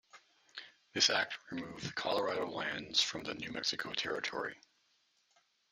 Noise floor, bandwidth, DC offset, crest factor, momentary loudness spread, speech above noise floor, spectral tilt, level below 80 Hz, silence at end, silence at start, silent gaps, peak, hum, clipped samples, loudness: -75 dBFS; 14.5 kHz; under 0.1%; 24 dB; 15 LU; 38 dB; -1.5 dB/octave; -74 dBFS; 1.15 s; 0.15 s; none; -14 dBFS; none; under 0.1%; -35 LUFS